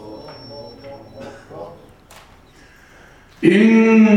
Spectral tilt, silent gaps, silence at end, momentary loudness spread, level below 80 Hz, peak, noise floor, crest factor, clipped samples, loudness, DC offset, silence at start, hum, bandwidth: -7 dB/octave; none; 0 s; 26 LU; -54 dBFS; 0 dBFS; -47 dBFS; 18 dB; under 0.1%; -13 LUFS; under 0.1%; 0.05 s; none; 9.6 kHz